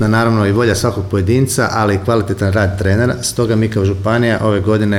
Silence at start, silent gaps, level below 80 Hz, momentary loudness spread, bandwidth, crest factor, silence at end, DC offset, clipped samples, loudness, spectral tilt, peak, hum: 0 s; none; -38 dBFS; 3 LU; 15.5 kHz; 12 dB; 0 s; under 0.1%; under 0.1%; -14 LUFS; -6 dB/octave; -2 dBFS; none